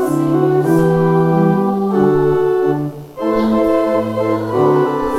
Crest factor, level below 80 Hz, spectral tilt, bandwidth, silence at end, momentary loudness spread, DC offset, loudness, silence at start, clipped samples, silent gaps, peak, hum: 12 dB; -42 dBFS; -8.5 dB/octave; 15 kHz; 0 s; 5 LU; under 0.1%; -15 LUFS; 0 s; under 0.1%; none; -2 dBFS; none